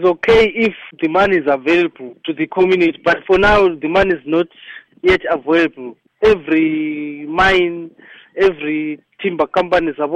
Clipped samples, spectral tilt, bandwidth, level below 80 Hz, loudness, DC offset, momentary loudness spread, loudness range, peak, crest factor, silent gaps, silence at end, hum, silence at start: under 0.1%; -6 dB/octave; 8.6 kHz; -38 dBFS; -15 LUFS; under 0.1%; 13 LU; 3 LU; -2 dBFS; 12 dB; none; 0 s; none; 0 s